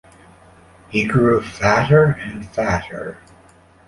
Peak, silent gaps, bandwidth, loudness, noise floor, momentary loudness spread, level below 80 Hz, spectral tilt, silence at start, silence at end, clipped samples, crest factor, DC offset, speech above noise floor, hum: -2 dBFS; none; 11.5 kHz; -17 LUFS; -49 dBFS; 15 LU; -42 dBFS; -7 dB/octave; 0.9 s; 0.75 s; under 0.1%; 18 dB; under 0.1%; 32 dB; none